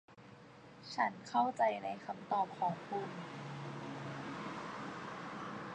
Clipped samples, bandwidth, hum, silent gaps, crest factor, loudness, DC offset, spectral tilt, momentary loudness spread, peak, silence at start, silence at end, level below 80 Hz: under 0.1%; 10 kHz; none; none; 20 dB; -40 LUFS; under 0.1%; -5.5 dB/octave; 17 LU; -20 dBFS; 0.1 s; 0 s; -78 dBFS